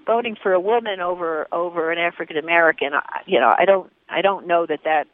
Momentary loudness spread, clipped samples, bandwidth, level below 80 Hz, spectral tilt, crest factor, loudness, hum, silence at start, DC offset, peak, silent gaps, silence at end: 8 LU; under 0.1%; 3.9 kHz; -70 dBFS; -7.5 dB/octave; 18 dB; -20 LUFS; none; 0.05 s; under 0.1%; 0 dBFS; none; 0.1 s